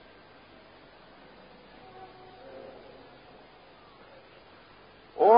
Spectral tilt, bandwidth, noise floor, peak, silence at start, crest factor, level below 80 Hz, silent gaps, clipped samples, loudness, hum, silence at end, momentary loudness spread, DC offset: -3.5 dB/octave; 5 kHz; -54 dBFS; -6 dBFS; 5.2 s; 26 dB; -68 dBFS; none; under 0.1%; -37 LUFS; none; 0 s; 6 LU; under 0.1%